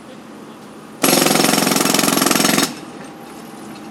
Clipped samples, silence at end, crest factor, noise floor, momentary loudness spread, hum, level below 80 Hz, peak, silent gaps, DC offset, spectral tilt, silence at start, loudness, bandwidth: under 0.1%; 0 s; 18 dB; -37 dBFS; 23 LU; none; -62 dBFS; 0 dBFS; none; under 0.1%; -2.5 dB/octave; 0 s; -14 LUFS; 17.5 kHz